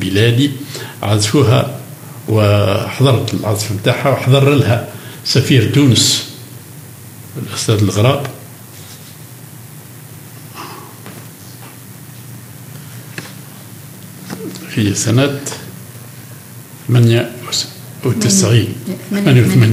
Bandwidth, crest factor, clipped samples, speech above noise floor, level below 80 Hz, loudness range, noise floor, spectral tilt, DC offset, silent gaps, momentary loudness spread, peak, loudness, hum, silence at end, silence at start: 16 kHz; 16 dB; under 0.1%; 22 dB; -54 dBFS; 19 LU; -34 dBFS; -5 dB/octave; under 0.1%; none; 23 LU; 0 dBFS; -13 LUFS; none; 0 s; 0 s